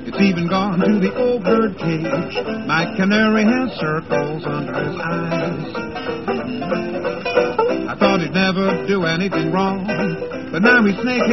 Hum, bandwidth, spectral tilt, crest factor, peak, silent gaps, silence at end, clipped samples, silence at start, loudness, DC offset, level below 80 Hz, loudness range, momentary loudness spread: none; 6.2 kHz; -6.5 dB/octave; 16 dB; -2 dBFS; none; 0 s; under 0.1%; 0 s; -19 LUFS; 0.6%; -48 dBFS; 5 LU; 9 LU